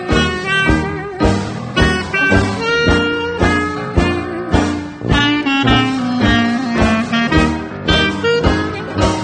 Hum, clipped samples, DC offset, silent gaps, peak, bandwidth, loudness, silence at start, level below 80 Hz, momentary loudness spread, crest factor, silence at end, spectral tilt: none; under 0.1%; under 0.1%; none; 0 dBFS; 9.4 kHz; -15 LUFS; 0 s; -26 dBFS; 5 LU; 14 dB; 0 s; -5.5 dB/octave